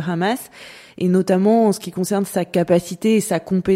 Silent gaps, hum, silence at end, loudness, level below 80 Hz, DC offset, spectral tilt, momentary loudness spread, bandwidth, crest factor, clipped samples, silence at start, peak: none; none; 0 s; -19 LUFS; -54 dBFS; under 0.1%; -6 dB/octave; 11 LU; 16 kHz; 14 dB; under 0.1%; 0 s; -4 dBFS